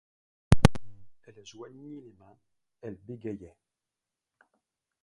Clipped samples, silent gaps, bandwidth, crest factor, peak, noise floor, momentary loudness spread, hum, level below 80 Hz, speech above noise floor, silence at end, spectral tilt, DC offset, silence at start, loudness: under 0.1%; none; 12 kHz; 30 dB; 0 dBFS; -89 dBFS; 25 LU; none; -42 dBFS; 45 dB; 1.6 s; -6.5 dB/octave; under 0.1%; 0.5 s; -27 LUFS